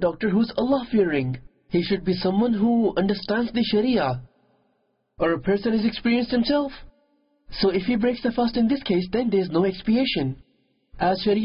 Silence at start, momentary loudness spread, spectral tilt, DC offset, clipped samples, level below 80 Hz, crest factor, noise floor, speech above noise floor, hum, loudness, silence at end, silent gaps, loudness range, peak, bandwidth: 0 s; 6 LU; -11 dB/octave; under 0.1%; under 0.1%; -50 dBFS; 14 dB; -70 dBFS; 48 dB; none; -23 LUFS; 0 s; none; 2 LU; -10 dBFS; 5.6 kHz